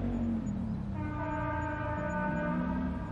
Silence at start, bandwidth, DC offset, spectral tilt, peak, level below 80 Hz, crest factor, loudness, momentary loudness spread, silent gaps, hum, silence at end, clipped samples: 0 s; 7.4 kHz; under 0.1%; -8.5 dB/octave; -22 dBFS; -44 dBFS; 12 dB; -34 LUFS; 3 LU; none; none; 0 s; under 0.1%